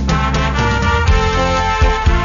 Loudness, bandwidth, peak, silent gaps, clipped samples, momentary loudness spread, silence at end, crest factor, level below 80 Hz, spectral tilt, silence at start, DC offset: -15 LUFS; 7.4 kHz; -4 dBFS; none; under 0.1%; 2 LU; 0 s; 10 dB; -18 dBFS; -5.5 dB/octave; 0 s; under 0.1%